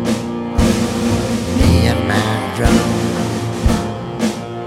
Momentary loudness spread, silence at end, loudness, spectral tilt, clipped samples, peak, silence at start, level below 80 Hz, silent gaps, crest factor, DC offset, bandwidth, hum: 7 LU; 0 s; -17 LUFS; -5.5 dB/octave; under 0.1%; 0 dBFS; 0 s; -24 dBFS; none; 16 dB; under 0.1%; 16 kHz; none